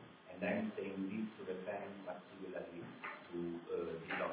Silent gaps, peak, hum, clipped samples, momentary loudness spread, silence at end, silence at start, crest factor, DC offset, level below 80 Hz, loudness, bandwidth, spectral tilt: none; -26 dBFS; none; under 0.1%; 9 LU; 0 s; 0 s; 18 dB; under 0.1%; -76 dBFS; -44 LUFS; 4 kHz; -5 dB/octave